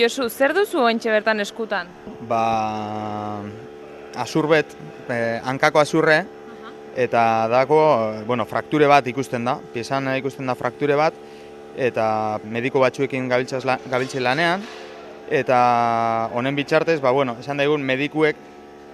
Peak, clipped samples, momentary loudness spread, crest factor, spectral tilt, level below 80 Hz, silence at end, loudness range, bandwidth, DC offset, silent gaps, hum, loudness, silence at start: 0 dBFS; under 0.1%; 18 LU; 20 dB; -5.5 dB/octave; -62 dBFS; 0 s; 5 LU; 14 kHz; under 0.1%; none; none; -20 LUFS; 0 s